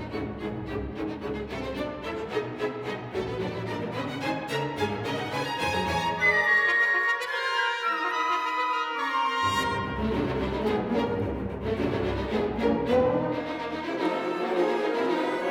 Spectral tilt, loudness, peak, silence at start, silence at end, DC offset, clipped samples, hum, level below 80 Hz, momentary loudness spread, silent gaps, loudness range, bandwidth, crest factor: -5.5 dB/octave; -27 LUFS; -12 dBFS; 0 s; 0 s; under 0.1%; under 0.1%; none; -46 dBFS; 11 LU; none; 8 LU; 18.5 kHz; 16 dB